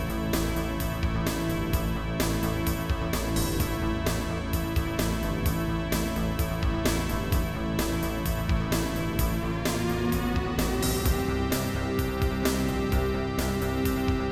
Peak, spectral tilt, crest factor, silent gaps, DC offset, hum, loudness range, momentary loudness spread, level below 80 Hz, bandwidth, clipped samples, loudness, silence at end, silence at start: -12 dBFS; -5.5 dB/octave; 16 dB; none; under 0.1%; none; 1 LU; 2 LU; -32 dBFS; 19 kHz; under 0.1%; -28 LUFS; 0 s; 0 s